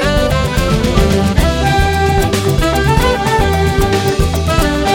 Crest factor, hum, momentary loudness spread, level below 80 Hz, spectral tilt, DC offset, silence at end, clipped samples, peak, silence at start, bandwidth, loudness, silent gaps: 12 dB; none; 2 LU; -18 dBFS; -5.5 dB/octave; under 0.1%; 0 s; under 0.1%; 0 dBFS; 0 s; 18.5 kHz; -13 LUFS; none